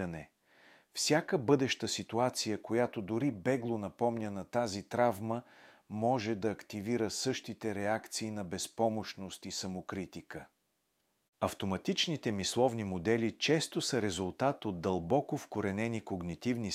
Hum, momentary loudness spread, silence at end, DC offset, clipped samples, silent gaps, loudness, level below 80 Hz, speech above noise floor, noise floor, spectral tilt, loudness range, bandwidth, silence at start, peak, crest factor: none; 10 LU; 0 s; under 0.1%; under 0.1%; 11.28-11.33 s; -34 LUFS; -68 dBFS; 45 dB; -79 dBFS; -4.5 dB/octave; 6 LU; 16 kHz; 0 s; -14 dBFS; 20 dB